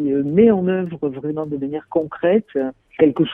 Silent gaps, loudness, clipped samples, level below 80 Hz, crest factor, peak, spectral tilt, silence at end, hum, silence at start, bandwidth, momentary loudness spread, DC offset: none; -19 LUFS; under 0.1%; -54 dBFS; 16 dB; -2 dBFS; -10 dB/octave; 0 s; none; 0 s; 3.7 kHz; 11 LU; under 0.1%